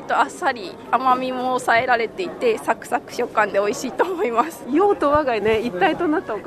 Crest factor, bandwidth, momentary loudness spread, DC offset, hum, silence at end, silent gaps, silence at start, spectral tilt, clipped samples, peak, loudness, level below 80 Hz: 16 dB; 13.5 kHz; 6 LU; under 0.1%; none; 0 s; none; 0 s; -4.5 dB/octave; under 0.1%; -4 dBFS; -20 LUFS; -52 dBFS